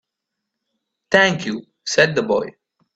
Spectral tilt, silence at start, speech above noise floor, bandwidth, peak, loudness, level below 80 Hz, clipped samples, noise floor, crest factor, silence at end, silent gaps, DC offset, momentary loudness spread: -4 dB/octave; 1.1 s; 63 dB; 9 kHz; 0 dBFS; -18 LUFS; -60 dBFS; under 0.1%; -81 dBFS; 22 dB; 0.45 s; none; under 0.1%; 13 LU